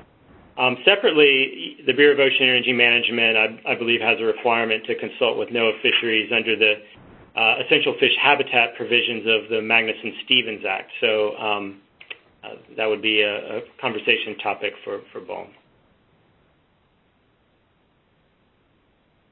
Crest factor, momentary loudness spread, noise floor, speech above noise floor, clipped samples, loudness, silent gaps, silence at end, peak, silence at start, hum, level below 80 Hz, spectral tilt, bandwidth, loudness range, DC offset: 22 dB; 17 LU; -63 dBFS; 42 dB; under 0.1%; -19 LUFS; none; 3.85 s; 0 dBFS; 0.55 s; none; -66 dBFS; -8 dB/octave; 4.4 kHz; 10 LU; under 0.1%